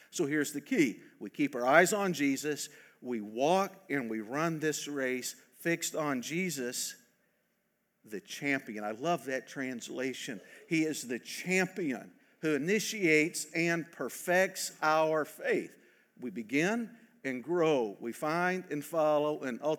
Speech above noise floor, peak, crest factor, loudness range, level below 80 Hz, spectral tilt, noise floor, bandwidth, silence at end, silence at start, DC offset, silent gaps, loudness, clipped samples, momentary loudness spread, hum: 46 dB; -8 dBFS; 24 dB; 6 LU; under -90 dBFS; -4 dB/octave; -78 dBFS; 19.5 kHz; 0 s; 0.15 s; under 0.1%; none; -32 LUFS; under 0.1%; 11 LU; none